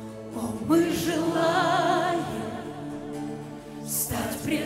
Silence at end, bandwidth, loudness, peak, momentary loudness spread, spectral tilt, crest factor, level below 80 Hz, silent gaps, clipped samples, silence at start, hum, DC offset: 0 s; 16 kHz; -27 LUFS; -10 dBFS; 14 LU; -4.5 dB/octave; 16 dB; -54 dBFS; none; under 0.1%; 0 s; none; under 0.1%